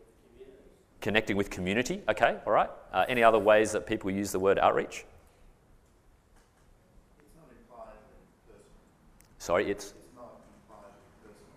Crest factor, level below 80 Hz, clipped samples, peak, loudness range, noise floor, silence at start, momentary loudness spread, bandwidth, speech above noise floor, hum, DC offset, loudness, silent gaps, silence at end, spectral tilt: 24 dB; -56 dBFS; under 0.1%; -8 dBFS; 12 LU; -62 dBFS; 0.4 s; 20 LU; 15.5 kHz; 35 dB; none; under 0.1%; -28 LUFS; none; 0.7 s; -4.5 dB/octave